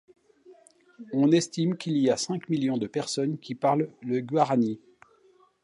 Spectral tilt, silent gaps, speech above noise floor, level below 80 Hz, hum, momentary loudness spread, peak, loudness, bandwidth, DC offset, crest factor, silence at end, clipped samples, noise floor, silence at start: -5.5 dB/octave; none; 36 dB; -74 dBFS; none; 8 LU; -8 dBFS; -27 LUFS; 11.5 kHz; under 0.1%; 18 dB; 0.85 s; under 0.1%; -61 dBFS; 0.5 s